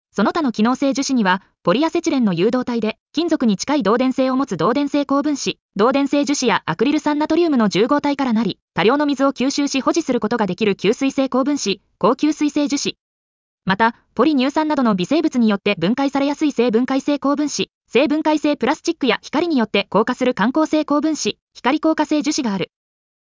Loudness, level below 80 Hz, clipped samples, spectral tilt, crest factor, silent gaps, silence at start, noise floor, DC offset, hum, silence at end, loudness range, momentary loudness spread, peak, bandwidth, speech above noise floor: -18 LUFS; -58 dBFS; under 0.1%; -4.5 dB/octave; 14 dB; 3.00-3.06 s, 5.62-5.69 s, 8.62-8.68 s, 13.00-13.58 s, 17.75-17.81 s, 21.42-21.47 s; 0.15 s; under -90 dBFS; under 0.1%; none; 0.6 s; 2 LU; 4 LU; -4 dBFS; 7.6 kHz; over 72 dB